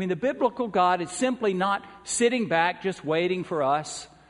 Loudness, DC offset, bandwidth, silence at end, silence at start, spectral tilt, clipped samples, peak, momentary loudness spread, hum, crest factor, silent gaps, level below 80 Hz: -25 LUFS; under 0.1%; 11 kHz; 0.25 s; 0 s; -4 dB/octave; under 0.1%; -8 dBFS; 6 LU; none; 18 dB; none; -64 dBFS